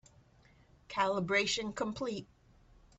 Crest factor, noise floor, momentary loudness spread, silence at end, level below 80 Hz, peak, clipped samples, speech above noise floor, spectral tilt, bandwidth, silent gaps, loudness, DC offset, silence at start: 20 dB; -64 dBFS; 10 LU; 0.75 s; -64 dBFS; -16 dBFS; under 0.1%; 30 dB; -3.5 dB/octave; 8.2 kHz; none; -34 LUFS; under 0.1%; 0.9 s